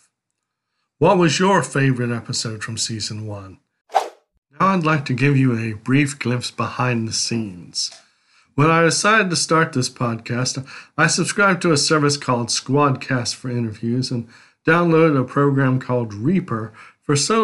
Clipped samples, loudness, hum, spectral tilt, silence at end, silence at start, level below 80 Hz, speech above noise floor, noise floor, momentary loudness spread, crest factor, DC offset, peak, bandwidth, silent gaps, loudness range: under 0.1%; -19 LUFS; none; -4.5 dB/octave; 0 s; 1 s; -58 dBFS; 60 dB; -78 dBFS; 11 LU; 18 dB; under 0.1%; -2 dBFS; 12 kHz; 3.81-3.85 s, 4.38-4.42 s; 4 LU